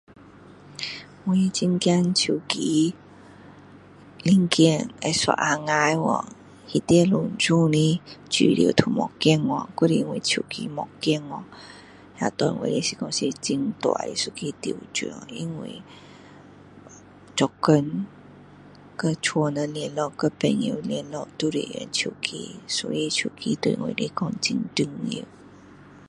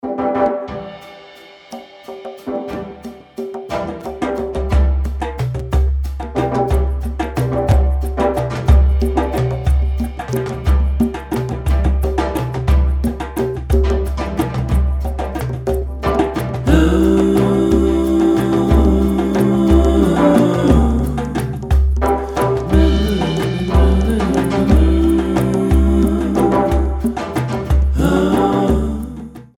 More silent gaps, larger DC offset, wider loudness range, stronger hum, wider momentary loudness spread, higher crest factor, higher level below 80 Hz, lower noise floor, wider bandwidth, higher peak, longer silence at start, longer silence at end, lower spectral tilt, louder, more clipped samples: neither; neither; about the same, 7 LU vs 8 LU; neither; about the same, 13 LU vs 11 LU; first, 24 dB vs 16 dB; second, -60 dBFS vs -20 dBFS; first, -48 dBFS vs -40 dBFS; second, 11.5 kHz vs 14 kHz; about the same, 0 dBFS vs 0 dBFS; first, 0.2 s vs 0.05 s; about the same, 0.1 s vs 0.15 s; second, -4.5 dB/octave vs -7.5 dB/octave; second, -24 LUFS vs -16 LUFS; neither